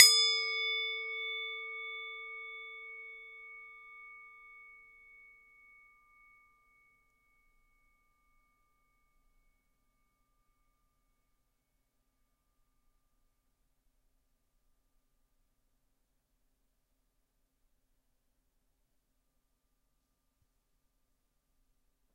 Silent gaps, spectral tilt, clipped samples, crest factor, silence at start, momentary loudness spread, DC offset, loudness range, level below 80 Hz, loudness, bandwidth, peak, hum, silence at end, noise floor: none; 5 dB/octave; under 0.1%; 38 dB; 0 s; 24 LU; under 0.1%; 24 LU; -78 dBFS; -31 LUFS; 16 kHz; -2 dBFS; none; 17.5 s; -79 dBFS